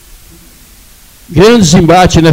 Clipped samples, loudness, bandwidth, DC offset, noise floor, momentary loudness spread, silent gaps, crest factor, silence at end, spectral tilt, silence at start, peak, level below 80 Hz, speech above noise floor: 0.8%; -5 LUFS; 16.5 kHz; under 0.1%; -37 dBFS; 4 LU; none; 8 dB; 0 s; -5.5 dB/octave; 1.3 s; 0 dBFS; -26 dBFS; 32 dB